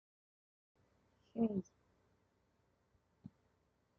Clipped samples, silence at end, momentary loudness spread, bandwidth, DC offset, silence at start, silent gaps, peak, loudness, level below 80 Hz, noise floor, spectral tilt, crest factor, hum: under 0.1%; 2.35 s; 23 LU; 6.6 kHz; under 0.1%; 1.35 s; none; -24 dBFS; -41 LUFS; -82 dBFS; -79 dBFS; -10 dB/octave; 24 dB; none